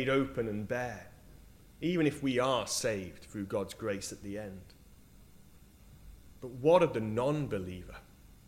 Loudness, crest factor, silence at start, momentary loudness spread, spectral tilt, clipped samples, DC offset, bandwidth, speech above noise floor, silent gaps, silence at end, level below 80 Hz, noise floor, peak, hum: -33 LUFS; 22 dB; 0 s; 20 LU; -5 dB/octave; under 0.1%; under 0.1%; 16 kHz; 24 dB; none; 0.2 s; -58 dBFS; -57 dBFS; -12 dBFS; none